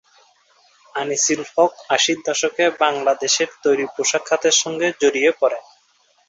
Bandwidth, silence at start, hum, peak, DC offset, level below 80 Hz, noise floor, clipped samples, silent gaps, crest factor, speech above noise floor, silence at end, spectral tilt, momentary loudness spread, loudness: 8 kHz; 0.95 s; none; -2 dBFS; under 0.1%; -68 dBFS; -60 dBFS; under 0.1%; none; 18 dB; 41 dB; 0.7 s; -1 dB/octave; 5 LU; -18 LUFS